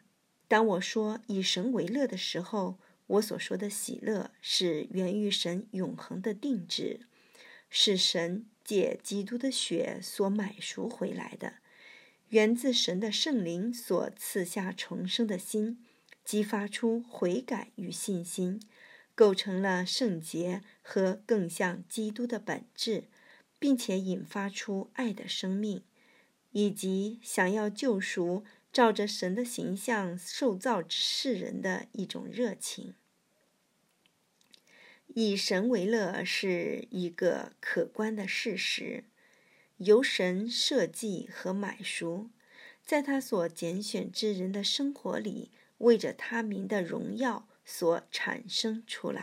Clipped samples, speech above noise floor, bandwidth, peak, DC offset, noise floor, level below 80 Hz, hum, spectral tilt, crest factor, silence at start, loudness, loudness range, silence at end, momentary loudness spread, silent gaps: under 0.1%; 41 dB; 16 kHz; -10 dBFS; under 0.1%; -73 dBFS; under -90 dBFS; none; -4 dB/octave; 22 dB; 0.5 s; -31 LUFS; 4 LU; 0 s; 11 LU; none